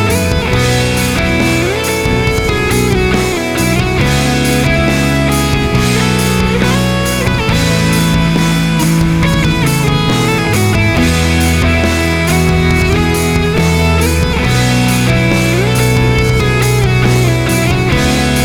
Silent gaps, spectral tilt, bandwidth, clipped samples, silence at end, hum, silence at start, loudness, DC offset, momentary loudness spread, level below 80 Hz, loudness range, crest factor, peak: none; -5 dB/octave; 19.5 kHz; under 0.1%; 0 s; none; 0 s; -11 LUFS; under 0.1%; 2 LU; -22 dBFS; 1 LU; 10 dB; 0 dBFS